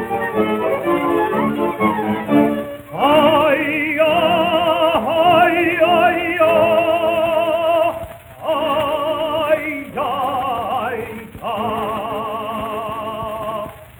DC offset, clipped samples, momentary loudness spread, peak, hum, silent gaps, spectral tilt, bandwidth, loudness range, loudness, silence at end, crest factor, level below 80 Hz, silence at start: under 0.1%; under 0.1%; 12 LU; -2 dBFS; none; none; -5.5 dB/octave; over 20 kHz; 8 LU; -17 LUFS; 0.1 s; 16 dB; -50 dBFS; 0 s